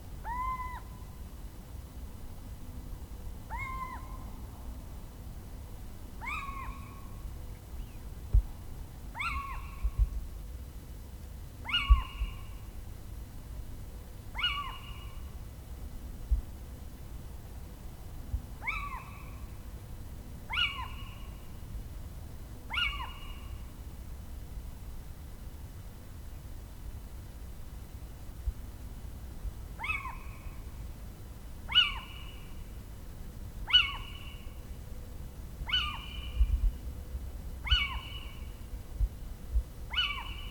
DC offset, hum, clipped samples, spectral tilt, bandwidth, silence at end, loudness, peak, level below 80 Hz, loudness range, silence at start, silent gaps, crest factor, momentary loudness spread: under 0.1%; none; under 0.1%; -3.5 dB/octave; over 20 kHz; 0 s; -36 LUFS; -10 dBFS; -38 dBFS; 13 LU; 0 s; none; 28 dB; 17 LU